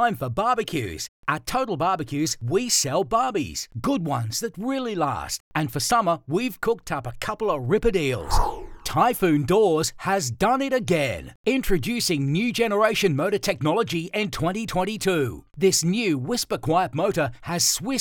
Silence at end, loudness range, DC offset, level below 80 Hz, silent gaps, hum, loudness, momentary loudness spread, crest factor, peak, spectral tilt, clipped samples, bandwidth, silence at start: 0 s; 3 LU; under 0.1%; -40 dBFS; 1.08-1.23 s, 5.40-5.51 s, 11.35-11.44 s; none; -24 LUFS; 7 LU; 18 dB; -6 dBFS; -4 dB/octave; under 0.1%; 20 kHz; 0 s